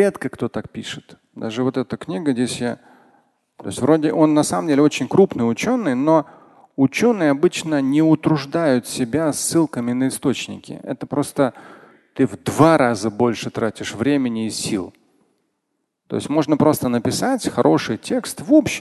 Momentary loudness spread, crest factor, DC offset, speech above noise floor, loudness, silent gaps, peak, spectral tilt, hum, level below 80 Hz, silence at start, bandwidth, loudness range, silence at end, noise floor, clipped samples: 13 LU; 20 dB; under 0.1%; 55 dB; -19 LUFS; none; 0 dBFS; -5.5 dB/octave; none; -54 dBFS; 0 s; 12.5 kHz; 6 LU; 0 s; -74 dBFS; under 0.1%